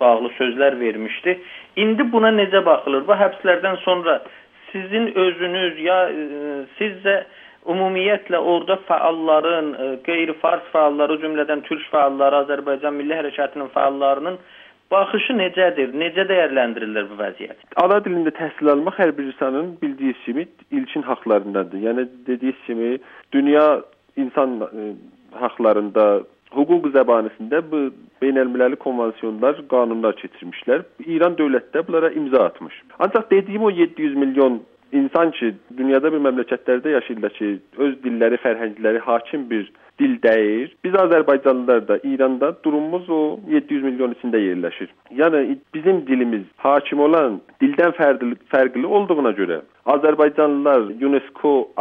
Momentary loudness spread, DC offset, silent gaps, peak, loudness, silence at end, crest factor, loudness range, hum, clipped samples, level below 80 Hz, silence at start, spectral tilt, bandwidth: 9 LU; under 0.1%; none; -2 dBFS; -19 LUFS; 0 s; 18 dB; 3 LU; none; under 0.1%; -72 dBFS; 0 s; -8 dB/octave; 4 kHz